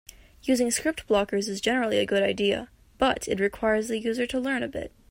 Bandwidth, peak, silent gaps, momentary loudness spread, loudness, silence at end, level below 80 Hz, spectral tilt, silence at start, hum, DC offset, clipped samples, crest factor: 16 kHz; -10 dBFS; none; 5 LU; -26 LUFS; 0.25 s; -52 dBFS; -3.5 dB/octave; 0.45 s; none; under 0.1%; under 0.1%; 16 dB